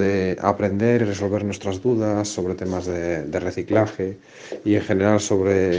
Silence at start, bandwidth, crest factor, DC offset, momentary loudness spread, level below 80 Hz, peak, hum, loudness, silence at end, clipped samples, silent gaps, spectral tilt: 0 s; 10 kHz; 20 dB; under 0.1%; 7 LU; -54 dBFS; 0 dBFS; none; -22 LUFS; 0 s; under 0.1%; none; -6 dB/octave